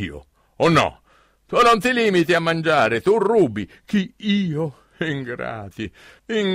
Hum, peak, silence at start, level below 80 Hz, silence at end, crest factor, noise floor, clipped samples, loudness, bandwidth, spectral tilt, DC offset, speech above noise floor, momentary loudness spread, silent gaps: none; -6 dBFS; 0 s; -52 dBFS; 0 s; 14 dB; -57 dBFS; under 0.1%; -19 LUFS; 16 kHz; -5.5 dB/octave; under 0.1%; 37 dB; 14 LU; none